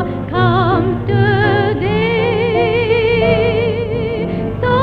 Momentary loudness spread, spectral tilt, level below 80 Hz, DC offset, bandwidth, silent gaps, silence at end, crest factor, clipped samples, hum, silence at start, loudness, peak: 6 LU; -9 dB/octave; -34 dBFS; under 0.1%; 5.2 kHz; none; 0 s; 14 dB; under 0.1%; none; 0 s; -15 LUFS; 0 dBFS